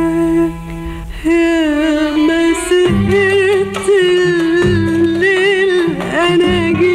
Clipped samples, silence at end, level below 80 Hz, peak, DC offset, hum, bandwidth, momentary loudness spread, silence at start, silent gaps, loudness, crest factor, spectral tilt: under 0.1%; 0 s; -32 dBFS; -4 dBFS; under 0.1%; none; 13 kHz; 5 LU; 0 s; none; -12 LUFS; 8 dB; -5.5 dB/octave